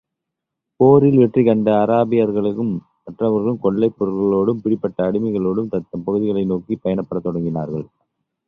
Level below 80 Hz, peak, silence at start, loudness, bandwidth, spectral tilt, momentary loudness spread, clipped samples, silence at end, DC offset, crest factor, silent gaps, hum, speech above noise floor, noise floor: -52 dBFS; -2 dBFS; 0.8 s; -18 LUFS; 4 kHz; -11 dB/octave; 10 LU; under 0.1%; 0.65 s; under 0.1%; 16 dB; none; none; 64 dB; -81 dBFS